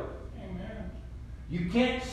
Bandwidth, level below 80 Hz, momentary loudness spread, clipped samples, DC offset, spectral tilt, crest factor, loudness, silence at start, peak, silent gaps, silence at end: 10.5 kHz; -44 dBFS; 18 LU; under 0.1%; under 0.1%; -6 dB/octave; 20 dB; -33 LUFS; 0 s; -14 dBFS; none; 0 s